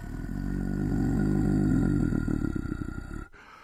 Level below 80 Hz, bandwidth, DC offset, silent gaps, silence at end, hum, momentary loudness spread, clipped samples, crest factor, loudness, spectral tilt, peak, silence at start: -36 dBFS; 14.5 kHz; under 0.1%; none; 0 s; none; 14 LU; under 0.1%; 14 dB; -29 LUFS; -9 dB/octave; -14 dBFS; 0 s